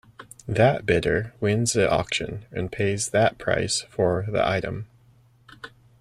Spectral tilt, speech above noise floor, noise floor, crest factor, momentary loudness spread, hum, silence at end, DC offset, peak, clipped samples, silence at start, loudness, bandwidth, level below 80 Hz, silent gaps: -4.5 dB/octave; 34 dB; -57 dBFS; 18 dB; 19 LU; none; 0.35 s; under 0.1%; -6 dBFS; under 0.1%; 0.2 s; -24 LUFS; 15 kHz; -48 dBFS; none